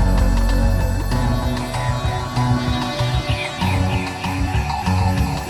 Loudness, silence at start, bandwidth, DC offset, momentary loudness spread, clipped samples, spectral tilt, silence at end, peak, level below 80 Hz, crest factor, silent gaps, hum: -20 LUFS; 0 s; 15 kHz; under 0.1%; 4 LU; under 0.1%; -6 dB/octave; 0 s; -6 dBFS; -22 dBFS; 14 dB; none; none